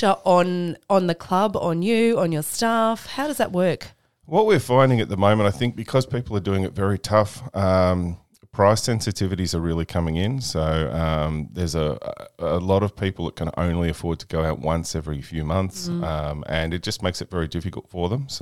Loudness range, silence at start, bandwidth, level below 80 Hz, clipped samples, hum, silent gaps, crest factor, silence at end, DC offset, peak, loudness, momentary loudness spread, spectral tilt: 5 LU; 0 s; 16 kHz; -40 dBFS; under 0.1%; none; none; 20 dB; 0 s; 0.4%; -2 dBFS; -23 LUFS; 9 LU; -6 dB/octave